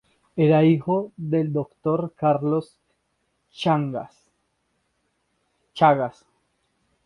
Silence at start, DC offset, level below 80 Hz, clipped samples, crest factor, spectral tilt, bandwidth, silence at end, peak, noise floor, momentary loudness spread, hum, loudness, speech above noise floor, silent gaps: 0.35 s; under 0.1%; -64 dBFS; under 0.1%; 22 dB; -8.5 dB/octave; 10.5 kHz; 0.95 s; -4 dBFS; -72 dBFS; 13 LU; none; -22 LUFS; 51 dB; none